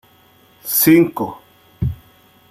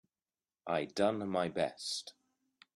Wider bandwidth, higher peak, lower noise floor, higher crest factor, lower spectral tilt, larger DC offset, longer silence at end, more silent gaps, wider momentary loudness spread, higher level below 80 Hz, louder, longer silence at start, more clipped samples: first, 15.5 kHz vs 12.5 kHz; first, -2 dBFS vs -16 dBFS; second, -51 dBFS vs under -90 dBFS; about the same, 18 dB vs 22 dB; about the same, -5 dB/octave vs -4.5 dB/octave; neither; about the same, 0.55 s vs 0.65 s; neither; first, 19 LU vs 12 LU; first, -42 dBFS vs -76 dBFS; first, -16 LUFS vs -36 LUFS; about the same, 0.65 s vs 0.65 s; neither